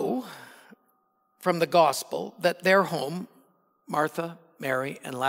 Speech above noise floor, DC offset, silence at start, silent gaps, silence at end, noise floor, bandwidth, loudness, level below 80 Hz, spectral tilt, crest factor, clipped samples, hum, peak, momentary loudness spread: 45 dB; under 0.1%; 0 s; none; 0 s; -70 dBFS; 16 kHz; -26 LUFS; -86 dBFS; -4.5 dB/octave; 20 dB; under 0.1%; none; -8 dBFS; 16 LU